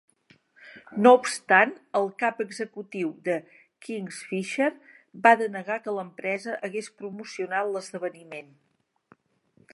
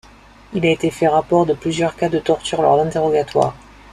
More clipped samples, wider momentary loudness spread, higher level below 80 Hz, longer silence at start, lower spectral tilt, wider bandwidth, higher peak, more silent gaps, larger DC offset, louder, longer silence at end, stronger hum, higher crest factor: neither; first, 17 LU vs 5 LU; second, -80 dBFS vs -48 dBFS; first, 0.65 s vs 0.5 s; second, -4.5 dB/octave vs -6 dB/octave; second, 11.5 kHz vs 13 kHz; about the same, -2 dBFS vs -2 dBFS; neither; neither; second, -25 LUFS vs -18 LUFS; first, 1.35 s vs 0.35 s; neither; first, 26 dB vs 16 dB